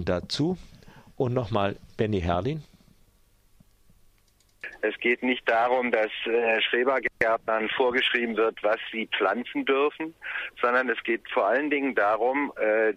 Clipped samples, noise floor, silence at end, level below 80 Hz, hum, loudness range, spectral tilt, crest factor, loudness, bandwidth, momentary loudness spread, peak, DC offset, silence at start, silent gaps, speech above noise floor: under 0.1%; -63 dBFS; 0 s; -54 dBFS; none; 7 LU; -6 dB/octave; 18 dB; -26 LUFS; 11.5 kHz; 8 LU; -8 dBFS; under 0.1%; 0 s; none; 37 dB